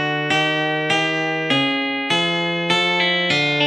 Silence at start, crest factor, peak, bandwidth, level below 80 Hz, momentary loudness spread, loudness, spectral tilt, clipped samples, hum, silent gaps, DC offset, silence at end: 0 s; 16 dB; -4 dBFS; 17 kHz; -68 dBFS; 3 LU; -18 LUFS; -4 dB/octave; under 0.1%; none; none; under 0.1%; 0 s